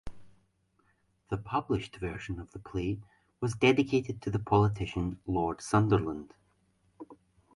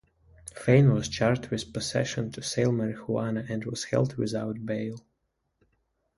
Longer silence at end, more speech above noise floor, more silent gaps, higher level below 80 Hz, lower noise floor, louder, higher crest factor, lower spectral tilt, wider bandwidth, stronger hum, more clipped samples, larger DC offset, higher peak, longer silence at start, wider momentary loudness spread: second, 0.4 s vs 1.2 s; second, 41 dB vs 51 dB; neither; first, -50 dBFS vs -56 dBFS; second, -71 dBFS vs -78 dBFS; second, -31 LUFS vs -28 LUFS; about the same, 20 dB vs 22 dB; about the same, -6.5 dB/octave vs -6 dB/octave; about the same, 11.5 kHz vs 11.5 kHz; neither; neither; neither; second, -12 dBFS vs -6 dBFS; second, 0.05 s vs 0.45 s; first, 15 LU vs 11 LU